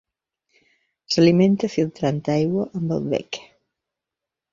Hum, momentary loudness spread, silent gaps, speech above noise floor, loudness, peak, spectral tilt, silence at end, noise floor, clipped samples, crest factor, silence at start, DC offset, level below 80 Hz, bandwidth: none; 11 LU; none; 66 dB; -21 LUFS; -4 dBFS; -6.5 dB/octave; 1.1 s; -86 dBFS; under 0.1%; 20 dB; 1.1 s; under 0.1%; -58 dBFS; 7.6 kHz